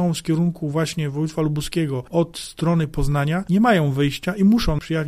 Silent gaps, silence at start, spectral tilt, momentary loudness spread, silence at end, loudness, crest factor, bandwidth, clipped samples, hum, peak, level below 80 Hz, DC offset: none; 0 s; -6.5 dB/octave; 7 LU; 0 s; -21 LUFS; 16 dB; 15 kHz; under 0.1%; none; -4 dBFS; -36 dBFS; under 0.1%